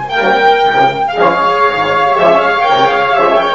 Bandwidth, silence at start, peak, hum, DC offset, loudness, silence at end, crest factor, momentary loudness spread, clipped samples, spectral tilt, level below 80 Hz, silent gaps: 7.8 kHz; 0 s; 0 dBFS; none; 0.8%; -10 LUFS; 0 s; 10 dB; 2 LU; under 0.1%; -5 dB/octave; -46 dBFS; none